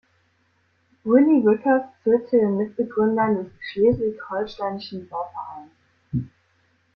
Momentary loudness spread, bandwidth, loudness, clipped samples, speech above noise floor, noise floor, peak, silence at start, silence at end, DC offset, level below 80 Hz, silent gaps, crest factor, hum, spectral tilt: 15 LU; 5.8 kHz; -22 LUFS; under 0.1%; 45 dB; -65 dBFS; -4 dBFS; 1.05 s; 0.7 s; under 0.1%; -56 dBFS; none; 18 dB; none; -9.5 dB/octave